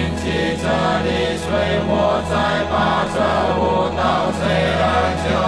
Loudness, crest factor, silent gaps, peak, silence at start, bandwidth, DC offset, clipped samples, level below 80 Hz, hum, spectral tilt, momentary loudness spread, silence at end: -18 LUFS; 14 dB; none; -4 dBFS; 0 s; 11 kHz; under 0.1%; under 0.1%; -34 dBFS; none; -5.5 dB/octave; 3 LU; 0 s